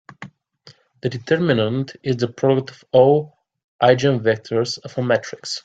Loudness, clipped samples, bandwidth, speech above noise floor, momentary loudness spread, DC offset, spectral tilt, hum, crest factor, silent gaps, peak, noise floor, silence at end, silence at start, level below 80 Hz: -19 LUFS; under 0.1%; 9 kHz; 32 dB; 12 LU; under 0.1%; -6 dB/octave; none; 18 dB; 3.64-3.79 s; -2 dBFS; -51 dBFS; 0.05 s; 0.2 s; -58 dBFS